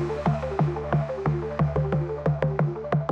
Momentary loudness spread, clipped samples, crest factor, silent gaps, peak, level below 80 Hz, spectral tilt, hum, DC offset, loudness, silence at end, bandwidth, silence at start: 2 LU; under 0.1%; 16 dB; none; -10 dBFS; -42 dBFS; -9.5 dB/octave; none; under 0.1%; -26 LUFS; 0 s; 6.4 kHz; 0 s